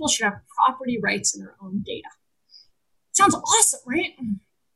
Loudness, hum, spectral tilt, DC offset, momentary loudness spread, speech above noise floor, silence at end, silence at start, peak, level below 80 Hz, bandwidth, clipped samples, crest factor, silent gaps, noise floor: -21 LUFS; none; -1.5 dB/octave; under 0.1%; 16 LU; 45 dB; 0.35 s; 0 s; -2 dBFS; -58 dBFS; 14 kHz; under 0.1%; 22 dB; none; -68 dBFS